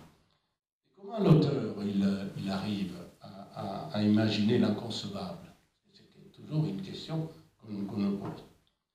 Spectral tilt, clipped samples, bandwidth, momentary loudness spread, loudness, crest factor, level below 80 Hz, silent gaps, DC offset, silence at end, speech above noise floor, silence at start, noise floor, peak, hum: -7.5 dB/octave; under 0.1%; 11 kHz; 19 LU; -31 LUFS; 22 dB; -64 dBFS; 0.72-0.81 s; under 0.1%; 0.45 s; 39 dB; 0 s; -68 dBFS; -12 dBFS; none